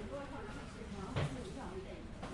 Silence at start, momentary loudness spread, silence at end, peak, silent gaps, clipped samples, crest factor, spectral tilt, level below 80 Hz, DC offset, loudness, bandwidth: 0 s; 8 LU; 0 s; -24 dBFS; none; under 0.1%; 20 dB; -6 dB/octave; -54 dBFS; under 0.1%; -45 LUFS; 11.5 kHz